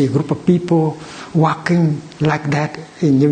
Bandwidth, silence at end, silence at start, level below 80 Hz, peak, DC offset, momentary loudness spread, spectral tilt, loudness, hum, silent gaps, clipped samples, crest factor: 9.2 kHz; 0 s; 0 s; -50 dBFS; 0 dBFS; under 0.1%; 7 LU; -7.5 dB/octave; -17 LUFS; none; none; under 0.1%; 16 dB